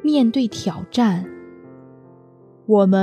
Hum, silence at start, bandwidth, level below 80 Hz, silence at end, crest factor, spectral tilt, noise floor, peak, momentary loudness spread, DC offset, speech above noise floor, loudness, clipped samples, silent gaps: none; 0 s; 10 kHz; -64 dBFS; 0 s; 16 dB; -7 dB/octave; -48 dBFS; -4 dBFS; 20 LU; under 0.1%; 31 dB; -19 LUFS; under 0.1%; none